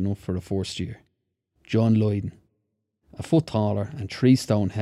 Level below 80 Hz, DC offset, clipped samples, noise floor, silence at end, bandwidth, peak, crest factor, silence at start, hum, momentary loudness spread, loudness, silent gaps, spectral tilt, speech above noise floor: -58 dBFS; under 0.1%; under 0.1%; -77 dBFS; 0 s; 13 kHz; -6 dBFS; 18 dB; 0 s; none; 13 LU; -24 LUFS; none; -7.5 dB/octave; 54 dB